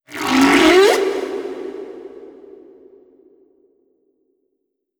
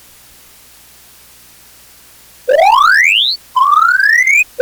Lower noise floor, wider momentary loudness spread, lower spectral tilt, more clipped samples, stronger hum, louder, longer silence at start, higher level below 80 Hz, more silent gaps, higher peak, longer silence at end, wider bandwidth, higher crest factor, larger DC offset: first, -74 dBFS vs -42 dBFS; first, 24 LU vs 6 LU; first, -3 dB/octave vs 2 dB/octave; neither; second, none vs 60 Hz at -55 dBFS; second, -14 LUFS vs -8 LUFS; second, 0.1 s vs 2.45 s; about the same, -52 dBFS vs -56 dBFS; neither; about the same, 0 dBFS vs 0 dBFS; first, 2.75 s vs 0 s; about the same, over 20 kHz vs over 20 kHz; about the same, 18 dB vs 14 dB; neither